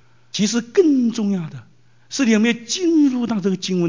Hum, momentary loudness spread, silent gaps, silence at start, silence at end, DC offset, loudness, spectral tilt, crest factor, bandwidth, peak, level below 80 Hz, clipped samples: none; 9 LU; none; 0.35 s; 0 s; 0.3%; -19 LUFS; -5 dB/octave; 14 dB; 7.6 kHz; -4 dBFS; -68 dBFS; under 0.1%